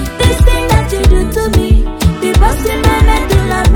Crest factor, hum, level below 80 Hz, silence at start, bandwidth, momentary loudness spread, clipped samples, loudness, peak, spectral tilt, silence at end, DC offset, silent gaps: 10 dB; none; -12 dBFS; 0 s; 18 kHz; 3 LU; 0.5%; -11 LUFS; 0 dBFS; -5.5 dB/octave; 0 s; under 0.1%; none